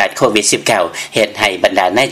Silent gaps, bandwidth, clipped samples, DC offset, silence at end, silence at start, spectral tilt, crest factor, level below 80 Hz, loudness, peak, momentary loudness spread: none; 16.5 kHz; under 0.1%; under 0.1%; 0 s; 0 s; -2.5 dB/octave; 14 dB; -50 dBFS; -13 LUFS; 0 dBFS; 4 LU